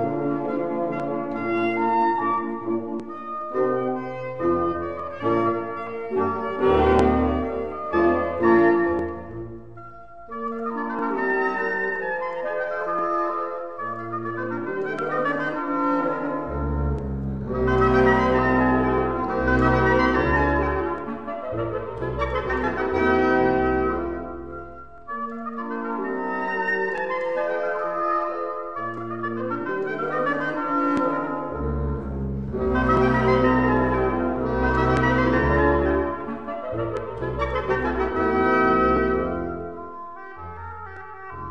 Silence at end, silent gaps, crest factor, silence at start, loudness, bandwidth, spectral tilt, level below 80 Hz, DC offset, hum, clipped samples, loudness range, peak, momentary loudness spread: 0 s; none; 18 dB; 0 s; -23 LUFS; 8.2 kHz; -8 dB/octave; -36 dBFS; 0.6%; none; under 0.1%; 6 LU; -6 dBFS; 12 LU